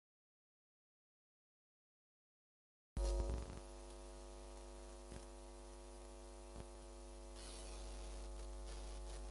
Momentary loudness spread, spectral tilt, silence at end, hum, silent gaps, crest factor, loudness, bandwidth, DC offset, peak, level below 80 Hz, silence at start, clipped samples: 12 LU; -5 dB/octave; 0 s; none; none; 22 dB; -52 LUFS; 11.5 kHz; under 0.1%; -30 dBFS; -52 dBFS; 2.95 s; under 0.1%